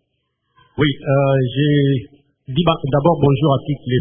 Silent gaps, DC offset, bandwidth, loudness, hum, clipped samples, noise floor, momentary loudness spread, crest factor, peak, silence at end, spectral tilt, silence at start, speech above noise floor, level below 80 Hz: none; under 0.1%; 3.7 kHz; -17 LUFS; none; under 0.1%; -71 dBFS; 6 LU; 18 dB; 0 dBFS; 0 s; -12.5 dB/octave; 0.75 s; 55 dB; -44 dBFS